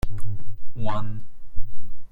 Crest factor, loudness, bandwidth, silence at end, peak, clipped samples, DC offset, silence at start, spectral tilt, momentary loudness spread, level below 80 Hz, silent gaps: 10 dB; -35 LUFS; 4.3 kHz; 0.05 s; -6 dBFS; under 0.1%; under 0.1%; 0.05 s; -7.5 dB/octave; 15 LU; -34 dBFS; none